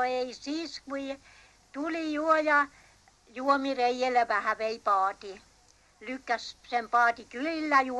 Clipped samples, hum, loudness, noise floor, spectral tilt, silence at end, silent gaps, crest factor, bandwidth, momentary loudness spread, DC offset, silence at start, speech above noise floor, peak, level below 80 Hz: under 0.1%; none; -29 LUFS; -62 dBFS; -3 dB/octave; 0 s; none; 20 dB; 12 kHz; 15 LU; under 0.1%; 0 s; 33 dB; -10 dBFS; -66 dBFS